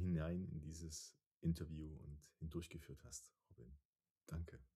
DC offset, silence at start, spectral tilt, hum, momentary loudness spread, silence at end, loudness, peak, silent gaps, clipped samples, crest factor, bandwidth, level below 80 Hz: under 0.1%; 0 s; -6 dB/octave; none; 20 LU; 0.1 s; -50 LUFS; -30 dBFS; 1.26-1.35 s, 3.85-3.93 s, 4.11-4.15 s; under 0.1%; 18 dB; 14 kHz; -60 dBFS